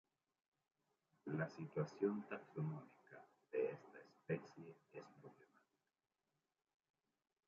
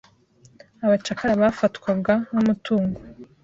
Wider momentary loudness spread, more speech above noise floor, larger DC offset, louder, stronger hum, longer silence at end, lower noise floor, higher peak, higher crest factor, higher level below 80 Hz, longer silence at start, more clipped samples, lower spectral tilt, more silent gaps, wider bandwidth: first, 20 LU vs 6 LU; first, over 44 dB vs 33 dB; neither; second, -47 LUFS vs -22 LUFS; neither; first, 2.15 s vs 0.2 s; first, under -90 dBFS vs -55 dBFS; second, -28 dBFS vs -6 dBFS; about the same, 22 dB vs 18 dB; second, under -90 dBFS vs -54 dBFS; first, 1.25 s vs 0.8 s; neither; first, -8 dB/octave vs -6.5 dB/octave; neither; about the same, 7.2 kHz vs 7.8 kHz